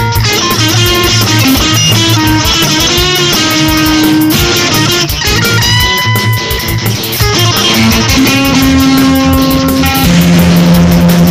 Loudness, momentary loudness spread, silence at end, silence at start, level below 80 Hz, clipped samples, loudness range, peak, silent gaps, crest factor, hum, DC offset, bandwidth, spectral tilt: -7 LUFS; 3 LU; 0 s; 0 s; -22 dBFS; under 0.1%; 2 LU; 0 dBFS; none; 8 dB; none; 0.5%; 16 kHz; -4 dB/octave